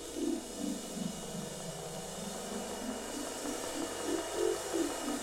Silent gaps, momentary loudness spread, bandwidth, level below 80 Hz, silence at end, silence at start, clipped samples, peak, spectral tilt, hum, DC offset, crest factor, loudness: none; 7 LU; 16 kHz; -60 dBFS; 0 s; 0 s; under 0.1%; -20 dBFS; -3.5 dB/octave; none; under 0.1%; 18 dB; -38 LUFS